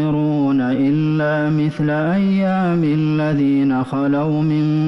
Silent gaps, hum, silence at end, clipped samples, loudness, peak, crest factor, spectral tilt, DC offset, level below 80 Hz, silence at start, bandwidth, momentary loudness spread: none; none; 0 s; under 0.1%; -17 LUFS; -10 dBFS; 6 dB; -9.5 dB/octave; under 0.1%; -50 dBFS; 0 s; 6 kHz; 2 LU